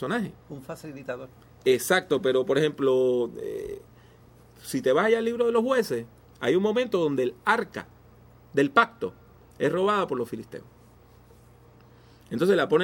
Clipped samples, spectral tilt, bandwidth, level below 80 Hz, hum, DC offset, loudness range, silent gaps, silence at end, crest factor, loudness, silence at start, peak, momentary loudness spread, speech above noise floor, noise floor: under 0.1%; -5 dB/octave; 16.5 kHz; -62 dBFS; none; under 0.1%; 3 LU; none; 0 s; 22 dB; -25 LUFS; 0 s; -4 dBFS; 17 LU; 29 dB; -54 dBFS